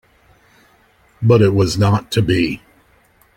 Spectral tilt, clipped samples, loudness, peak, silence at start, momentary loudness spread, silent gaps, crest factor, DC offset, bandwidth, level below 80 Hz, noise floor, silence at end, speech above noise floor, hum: -6.5 dB/octave; under 0.1%; -15 LUFS; -2 dBFS; 1.2 s; 9 LU; none; 16 dB; under 0.1%; 16 kHz; -44 dBFS; -54 dBFS; 0.8 s; 40 dB; none